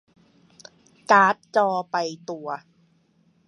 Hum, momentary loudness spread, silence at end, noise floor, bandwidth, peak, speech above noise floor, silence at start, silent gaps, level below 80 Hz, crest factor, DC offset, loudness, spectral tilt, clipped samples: none; 18 LU; 0.9 s; -63 dBFS; 11 kHz; -2 dBFS; 41 dB; 1.1 s; none; -80 dBFS; 22 dB; under 0.1%; -22 LUFS; -4.5 dB/octave; under 0.1%